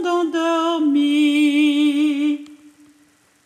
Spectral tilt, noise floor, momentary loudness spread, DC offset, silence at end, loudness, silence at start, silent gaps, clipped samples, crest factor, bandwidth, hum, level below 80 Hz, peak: -2.5 dB/octave; -56 dBFS; 5 LU; under 0.1%; 0.9 s; -18 LUFS; 0 s; none; under 0.1%; 12 dB; 9.6 kHz; none; -80 dBFS; -8 dBFS